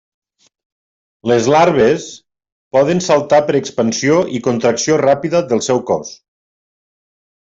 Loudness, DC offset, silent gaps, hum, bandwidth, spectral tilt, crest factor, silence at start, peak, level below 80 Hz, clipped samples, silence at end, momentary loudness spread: -14 LUFS; under 0.1%; 2.52-2.71 s; none; 8 kHz; -5 dB/octave; 14 dB; 1.25 s; -2 dBFS; -56 dBFS; under 0.1%; 1.3 s; 9 LU